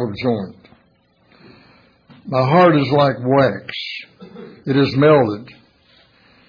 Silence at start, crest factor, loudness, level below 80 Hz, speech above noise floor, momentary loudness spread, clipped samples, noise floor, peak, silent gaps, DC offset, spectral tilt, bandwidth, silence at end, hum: 0 s; 16 dB; -16 LUFS; -56 dBFS; 42 dB; 20 LU; under 0.1%; -57 dBFS; -2 dBFS; none; under 0.1%; -8.5 dB/octave; 5.4 kHz; 1.05 s; none